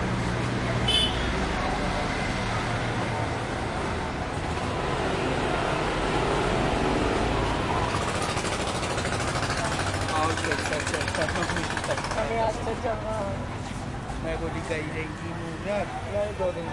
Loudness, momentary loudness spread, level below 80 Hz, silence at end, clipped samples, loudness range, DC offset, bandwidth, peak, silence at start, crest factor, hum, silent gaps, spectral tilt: -27 LUFS; 6 LU; -38 dBFS; 0 s; under 0.1%; 5 LU; under 0.1%; 11.5 kHz; -10 dBFS; 0 s; 16 dB; none; none; -4.5 dB/octave